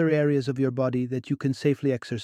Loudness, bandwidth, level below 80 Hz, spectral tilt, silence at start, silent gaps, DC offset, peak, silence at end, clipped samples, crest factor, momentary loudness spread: -26 LUFS; 10.5 kHz; -66 dBFS; -8 dB/octave; 0 s; none; under 0.1%; -10 dBFS; 0 s; under 0.1%; 14 dB; 6 LU